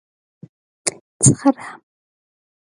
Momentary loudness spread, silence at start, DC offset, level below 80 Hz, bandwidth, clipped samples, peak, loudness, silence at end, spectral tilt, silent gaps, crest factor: 15 LU; 0.85 s; under 0.1%; -50 dBFS; 11.5 kHz; under 0.1%; 0 dBFS; -18 LUFS; 1 s; -5 dB/octave; 1.01-1.20 s; 22 dB